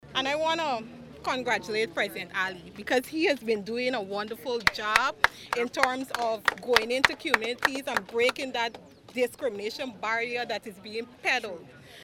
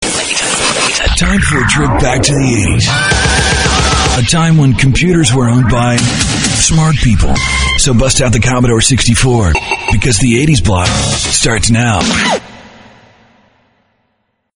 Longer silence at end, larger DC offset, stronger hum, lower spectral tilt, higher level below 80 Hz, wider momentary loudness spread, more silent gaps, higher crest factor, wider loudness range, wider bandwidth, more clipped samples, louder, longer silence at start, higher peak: second, 0 s vs 1.9 s; neither; neither; second, -2.5 dB/octave vs -4 dB/octave; second, -60 dBFS vs -20 dBFS; first, 10 LU vs 3 LU; neither; first, 26 dB vs 10 dB; first, 5 LU vs 2 LU; first, 17.5 kHz vs 11 kHz; neither; second, -28 LUFS vs -10 LUFS; about the same, 0.05 s vs 0 s; about the same, -2 dBFS vs 0 dBFS